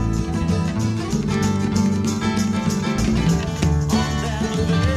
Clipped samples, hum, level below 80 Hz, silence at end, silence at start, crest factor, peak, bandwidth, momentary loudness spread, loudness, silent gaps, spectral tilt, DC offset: under 0.1%; none; -30 dBFS; 0 s; 0 s; 12 dB; -6 dBFS; 14 kHz; 3 LU; -21 LUFS; none; -6 dB/octave; under 0.1%